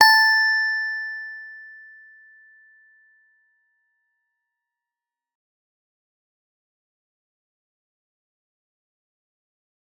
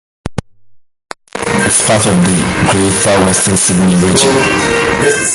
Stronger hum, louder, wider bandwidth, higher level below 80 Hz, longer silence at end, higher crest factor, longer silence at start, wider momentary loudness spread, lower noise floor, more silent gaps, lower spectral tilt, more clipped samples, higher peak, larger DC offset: neither; second, -18 LUFS vs -10 LUFS; first, 19.5 kHz vs 12 kHz; second, under -90 dBFS vs -34 dBFS; first, 8.3 s vs 0 s; first, 26 dB vs 12 dB; second, 0 s vs 0.25 s; first, 26 LU vs 14 LU; first, -90 dBFS vs -42 dBFS; neither; second, 2.5 dB/octave vs -3.5 dB/octave; neither; about the same, -2 dBFS vs 0 dBFS; neither